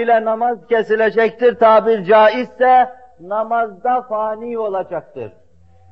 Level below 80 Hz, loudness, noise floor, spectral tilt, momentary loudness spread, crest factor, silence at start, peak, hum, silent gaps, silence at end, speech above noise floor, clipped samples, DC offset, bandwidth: -58 dBFS; -15 LUFS; -50 dBFS; -2.5 dB/octave; 13 LU; 14 dB; 0 s; -2 dBFS; none; none; 0.6 s; 35 dB; under 0.1%; 0.4%; 6 kHz